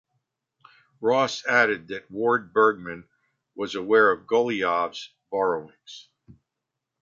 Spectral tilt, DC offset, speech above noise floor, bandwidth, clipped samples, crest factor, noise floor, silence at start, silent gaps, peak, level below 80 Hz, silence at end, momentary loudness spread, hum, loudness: -4.5 dB/octave; under 0.1%; 61 dB; 7.6 kHz; under 0.1%; 20 dB; -84 dBFS; 1 s; none; -6 dBFS; -68 dBFS; 0.7 s; 19 LU; none; -23 LUFS